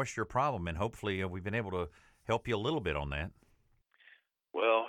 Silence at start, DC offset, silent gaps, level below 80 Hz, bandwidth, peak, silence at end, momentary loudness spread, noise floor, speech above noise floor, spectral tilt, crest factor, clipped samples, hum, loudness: 0 s; under 0.1%; none; -52 dBFS; 14.5 kHz; -16 dBFS; 0 s; 9 LU; -70 dBFS; 36 dB; -5.5 dB/octave; 20 dB; under 0.1%; none; -35 LUFS